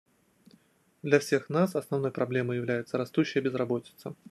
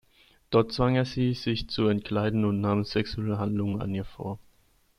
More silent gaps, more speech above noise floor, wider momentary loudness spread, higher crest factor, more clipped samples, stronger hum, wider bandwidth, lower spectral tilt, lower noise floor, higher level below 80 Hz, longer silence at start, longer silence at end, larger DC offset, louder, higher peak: neither; about the same, 35 dB vs 37 dB; about the same, 8 LU vs 9 LU; about the same, 22 dB vs 18 dB; neither; neither; first, 13 kHz vs 11.5 kHz; about the same, -6.5 dB/octave vs -7.5 dB/octave; about the same, -64 dBFS vs -64 dBFS; second, -74 dBFS vs -48 dBFS; first, 1.05 s vs 0.5 s; second, 0.15 s vs 0.6 s; neither; about the same, -29 LUFS vs -28 LUFS; about the same, -8 dBFS vs -10 dBFS